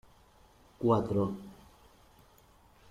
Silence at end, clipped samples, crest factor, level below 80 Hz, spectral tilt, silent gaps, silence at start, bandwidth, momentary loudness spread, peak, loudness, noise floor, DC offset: 1.4 s; under 0.1%; 20 dB; -62 dBFS; -9 dB/octave; none; 0.8 s; 15.5 kHz; 18 LU; -14 dBFS; -31 LUFS; -61 dBFS; under 0.1%